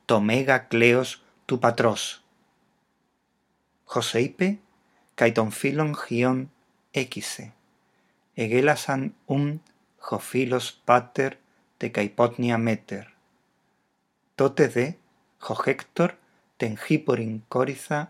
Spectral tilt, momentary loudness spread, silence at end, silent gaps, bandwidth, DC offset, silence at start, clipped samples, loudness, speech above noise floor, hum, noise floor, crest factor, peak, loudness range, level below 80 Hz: -5.5 dB/octave; 13 LU; 0.05 s; none; 15.5 kHz; under 0.1%; 0.1 s; under 0.1%; -25 LUFS; 48 dB; none; -72 dBFS; 24 dB; -2 dBFS; 3 LU; -72 dBFS